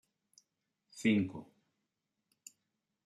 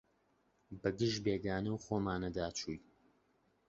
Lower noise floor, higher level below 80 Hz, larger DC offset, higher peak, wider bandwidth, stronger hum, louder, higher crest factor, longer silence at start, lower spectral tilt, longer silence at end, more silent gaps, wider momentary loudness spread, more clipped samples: first, -87 dBFS vs -76 dBFS; second, -80 dBFS vs -60 dBFS; neither; about the same, -18 dBFS vs -20 dBFS; first, 12.5 kHz vs 8 kHz; neither; first, -34 LUFS vs -38 LUFS; about the same, 22 dB vs 20 dB; first, 0.95 s vs 0.7 s; about the same, -5.5 dB/octave vs -5 dB/octave; first, 1.65 s vs 0.9 s; neither; first, 25 LU vs 9 LU; neither